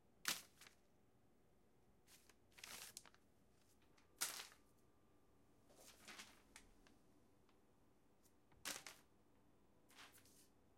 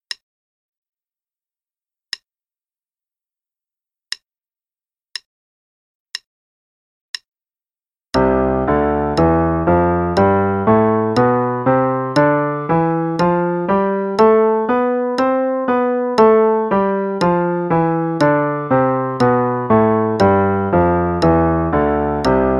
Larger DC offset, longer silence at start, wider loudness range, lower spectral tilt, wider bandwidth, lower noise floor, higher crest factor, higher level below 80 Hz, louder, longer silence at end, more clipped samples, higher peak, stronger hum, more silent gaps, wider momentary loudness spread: neither; second, 0.05 s vs 4.1 s; second, 11 LU vs 21 LU; second, 0 dB/octave vs -7.5 dB/octave; first, 16.5 kHz vs 11.5 kHz; second, -77 dBFS vs under -90 dBFS; first, 38 dB vs 16 dB; second, -84 dBFS vs -38 dBFS; second, -52 LUFS vs -15 LUFS; about the same, 0 s vs 0 s; neither; second, -22 dBFS vs 0 dBFS; neither; second, none vs 5.26-6.06 s, 6.26-7.14 s, 7.28-7.32 s; first, 22 LU vs 17 LU